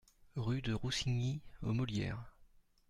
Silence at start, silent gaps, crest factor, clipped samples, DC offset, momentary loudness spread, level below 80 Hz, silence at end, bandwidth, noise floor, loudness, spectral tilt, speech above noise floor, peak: 0.35 s; none; 14 dB; under 0.1%; under 0.1%; 11 LU; -54 dBFS; 0.45 s; 12 kHz; -65 dBFS; -39 LUFS; -5.5 dB/octave; 28 dB; -26 dBFS